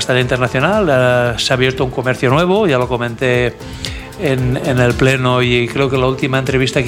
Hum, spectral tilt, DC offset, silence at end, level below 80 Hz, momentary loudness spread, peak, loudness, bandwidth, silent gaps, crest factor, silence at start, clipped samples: none; -5.5 dB/octave; under 0.1%; 0 s; -34 dBFS; 6 LU; 0 dBFS; -14 LUFS; 15.5 kHz; none; 14 dB; 0 s; under 0.1%